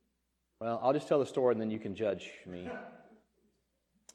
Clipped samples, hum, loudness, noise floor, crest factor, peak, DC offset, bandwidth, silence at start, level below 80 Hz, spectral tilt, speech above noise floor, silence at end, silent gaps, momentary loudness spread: under 0.1%; none; -33 LUFS; -80 dBFS; 20 dB; -16 dBFS; under 0.1%; 11 kHz; 0.6 s; -74 dBFS; -6.5 dB/octave; 47 dB; 1.15 s; none; 16 LU